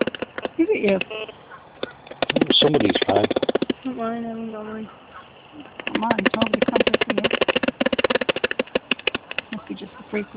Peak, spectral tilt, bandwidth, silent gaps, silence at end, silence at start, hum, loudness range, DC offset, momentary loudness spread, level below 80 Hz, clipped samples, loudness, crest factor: -2 dBFS; -9 dB/octave; 4 kHz; none; 0 s; 0 s; none; 5 LU; under 0.1%; 16 LU; -54 dBFS; under 0.1%; -21 LUFS; 20 dB